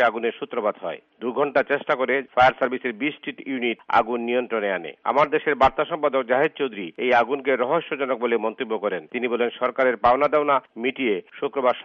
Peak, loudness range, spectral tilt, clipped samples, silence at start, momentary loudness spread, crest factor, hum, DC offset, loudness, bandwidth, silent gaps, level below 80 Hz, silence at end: -4 dBFS; 1 LU; -2 dB/octave; under 0.1%; 0 s; 8 LU; 18 dB; none; under 0.1%; -23 LUFS; 7.2 kHz; none; -56 dBFS; 0 s